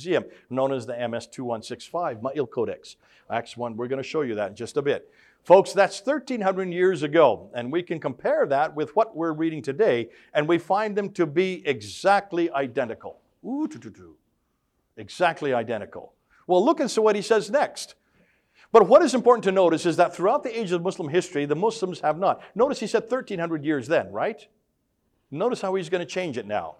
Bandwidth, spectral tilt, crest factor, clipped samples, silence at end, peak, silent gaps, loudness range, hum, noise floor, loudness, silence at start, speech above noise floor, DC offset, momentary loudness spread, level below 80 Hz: 12.5 kHz; -5.5 dB/octave; 22 dB; under 0.1%; 0.1 s; -2 dBFS; none; 9 LU; none; -72 dBFS; -24 LUFS; 0 s; 49 dB; under 0.1%; 12 LU; -70 dBFS